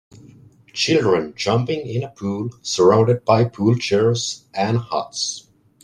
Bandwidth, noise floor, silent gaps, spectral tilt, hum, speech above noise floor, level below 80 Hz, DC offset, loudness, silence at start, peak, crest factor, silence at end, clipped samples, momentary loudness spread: 10.5 kHz; -47 dBFS; none; -5 dB/octave; none; 28 dB; -58 dBFS; under 0.1%; -19 LUFS; 0.75 s; -2 dBFS; 18 dB; 0.45 s; under 0.1%; 10 LU